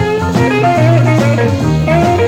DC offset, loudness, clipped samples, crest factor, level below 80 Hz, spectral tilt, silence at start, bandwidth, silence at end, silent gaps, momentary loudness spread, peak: under 0.1%; -11 LUFS; under 0.1%; 10 dB; -32 dBFS; -7 dB/octave; 0 s; 14 kHz; 0 s; none; 3 LU; 0 dBFS